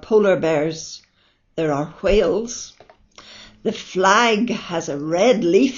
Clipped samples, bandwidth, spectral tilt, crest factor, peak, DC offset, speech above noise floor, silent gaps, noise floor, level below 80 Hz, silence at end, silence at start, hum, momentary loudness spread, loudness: under 0.1%; 7.4 kHz; -3.5 dB/octave; 18 dB; 0 dBFS; under 0.1%; 43 dB; none; -61 dBFS; -40 dBFS; 0 s; 0.05 s; none; 16 LU; -19 LUFS